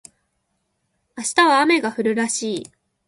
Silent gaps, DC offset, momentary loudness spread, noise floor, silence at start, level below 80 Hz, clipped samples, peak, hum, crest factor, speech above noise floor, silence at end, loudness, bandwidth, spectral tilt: none; under 0.1%; 13 LU; -72 dBFS; 1.15 s; -68 dBFS; under 0.1%; -4 dBFS; none; 18 dB; 53 dB; 0.45 s; -19 LUFS; 11.5 kHz; -2.5 dB/octave